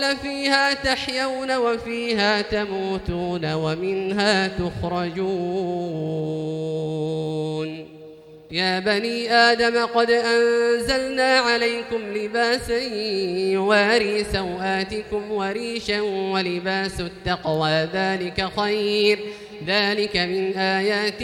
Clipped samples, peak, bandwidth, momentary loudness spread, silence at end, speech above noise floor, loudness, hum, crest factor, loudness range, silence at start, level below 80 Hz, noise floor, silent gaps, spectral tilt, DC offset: under 0.1%; -4 dBFS; 13.5 kHz; 9 LU; 0 s; 21 dB; -22 LUFS; none; 18 dB; 6 LU; 0 s; -46 dBFS; -43 dBFS; none; -4.5 dB/octave; under 0.1%